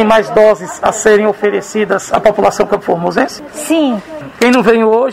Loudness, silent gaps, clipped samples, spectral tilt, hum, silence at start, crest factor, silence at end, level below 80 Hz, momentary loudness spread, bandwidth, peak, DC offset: -12 LUFS; none; 0.3%; -4.5 dB/octave; none; 0 s; 12 dB; 0 s; -44 dBFS; 7 LU; 15.5 kHz; 0 dBFS; under 0.1%